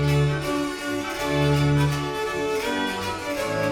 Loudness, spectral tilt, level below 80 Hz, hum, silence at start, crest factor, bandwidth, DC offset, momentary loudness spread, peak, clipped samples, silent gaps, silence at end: -24 LUFS; -5.5 dB/octave; -42 dBFS; none; 0 s; 14 dB; 16.5 kHz; under 0.1%; 7 LU; -10 dBFS; under 0.1%; none; 0 s